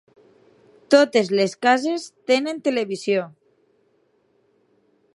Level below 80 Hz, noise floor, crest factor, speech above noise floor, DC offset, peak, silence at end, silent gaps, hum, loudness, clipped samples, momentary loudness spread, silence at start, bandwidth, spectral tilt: -78 dBFS; -64 dBFS; 22 dB; 44 dB; under 0.1%; -2 dBFS; 1.85 s; none; none; -20 LUFS; under 0.1%; 9 LU; 0.9 s; 11.5 kHz; -4 dB/octave